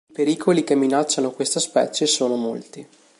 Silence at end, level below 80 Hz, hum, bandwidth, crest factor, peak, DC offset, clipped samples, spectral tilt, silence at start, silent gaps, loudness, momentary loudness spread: 0.35 s; -74 dBFS; none; 11.5 kHz; 16 dB; -4 dBFS; under 0.1%; under 0.1%; -3.5 dB/octave; 0.2 s; none; -20 LUFS; 8 LU